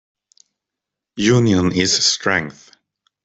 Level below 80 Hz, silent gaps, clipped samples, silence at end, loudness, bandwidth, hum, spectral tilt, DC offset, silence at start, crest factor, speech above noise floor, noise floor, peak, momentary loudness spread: -52 dBFS; none; under 0.1%; 0.75 s; -16 LUFS; 8.4 kHz; none; -4 dB/octave; under 0.1%; 1.15 s; 18 dB; 68 dB; -84 dBFS; -2 dBFS; 12 LU